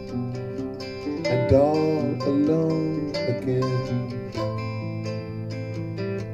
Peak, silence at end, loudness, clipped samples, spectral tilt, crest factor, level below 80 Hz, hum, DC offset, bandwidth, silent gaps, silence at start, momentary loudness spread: -6 dBFS; 0 s; -25 LUFS; under 0.1%; -8 dB/octave; 20 dB; -48 dBFS; none; under 0.1%; 9.8 kHz; none; 0 s; 12 LU